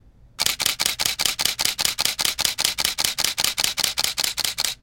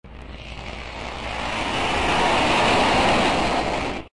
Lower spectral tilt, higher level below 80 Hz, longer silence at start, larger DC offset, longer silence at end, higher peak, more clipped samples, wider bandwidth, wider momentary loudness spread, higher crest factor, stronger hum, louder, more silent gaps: second, 1 dB/octave vs -4 dB/octave; second, -50 dBFS vs -38 dBFS; first, 0.4 s vs 0.05 s; neither; about the same, 0.1 s vs 0.05 s; first, 0 dBFS vs -8 dBFS; neither; first, 17.5 kHz vs 11.5 kHz; second, 2 LU vs 17 LU; first, 24 dB vs 14 dB; neither; about the same, -21 LUFS vs -20 LUFS; neither